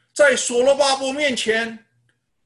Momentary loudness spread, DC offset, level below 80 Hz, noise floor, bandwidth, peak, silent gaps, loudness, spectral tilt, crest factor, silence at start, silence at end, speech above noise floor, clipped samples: 6 LU; under 0.1%; -62 dBFS; -66 dBFS; 12 kHz; -4 dBFS; none; -18 LUFS; -1 dB/octave; 16 dB; 0.15 s; 0.7 s; 48 dB; under 0.1%